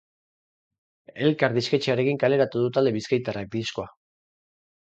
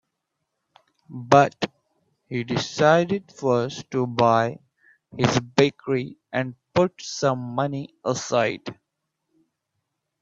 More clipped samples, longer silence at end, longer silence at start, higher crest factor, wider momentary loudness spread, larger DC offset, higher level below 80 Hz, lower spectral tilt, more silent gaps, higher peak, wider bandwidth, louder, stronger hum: neither; second, 1.05 s vs 1.5 s; about the same, 1.15 s vs 1.1 s; about the same, 22 dB vs 24 dB; second, 8 LU vs 13 LU; neither; about the same, -62 dBFS vs -62 dBFS; about the same, -6 dB/octave vs -5.5 dB/octave; neither; second, -4 dBFS vs 0 dBFS; about the same, 8.2 kHz vs 7.8 kHz; about the same, -24 LUFS vs -23 LUFS; neither